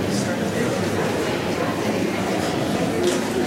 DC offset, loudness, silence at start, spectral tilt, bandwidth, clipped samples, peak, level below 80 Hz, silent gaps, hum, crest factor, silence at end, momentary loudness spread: under 0.1%; -22 LUFS; 0 s; -5 dB/octave; 16 kHz; under 0.1%; -8 dBFS; -50 dBFS; none; none; 14 dB; 0 s; 2 LU